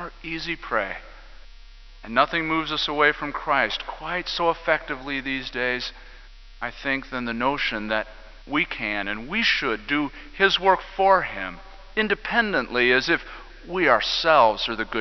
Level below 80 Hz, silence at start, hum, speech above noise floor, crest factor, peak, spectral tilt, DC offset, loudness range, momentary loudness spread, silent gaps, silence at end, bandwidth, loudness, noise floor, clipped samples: -46 dBFS; 0 s; none; 21 dB; 22 dB; -2 dBFS; -4 dB/octave; under 0.1%; 6 LU; 12 LU; none; 0 s; 6.2 kHz; -23 LUFS; -44 dBFS; under 0.1%